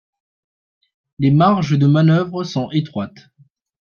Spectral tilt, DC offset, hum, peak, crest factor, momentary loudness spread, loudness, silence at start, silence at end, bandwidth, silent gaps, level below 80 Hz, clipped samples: -8 dB/octave; under 0.1%; none; -2 dBFS; 16 dB; 13 LU; -16 LUFS; 1.2 s; 0.7 s; 6.8 kHz; none; -56 dBFS; under 0.1%